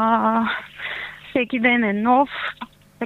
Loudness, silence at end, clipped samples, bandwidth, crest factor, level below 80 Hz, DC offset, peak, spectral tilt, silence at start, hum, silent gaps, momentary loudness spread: -21 LUFS; 0 s; under 0.1%; 4.4 kHz; 18 dB; -58 dBFS; under 0.1%; -4 dBFS; -6.5 dB/octave; 0 s; none; none; 12 LU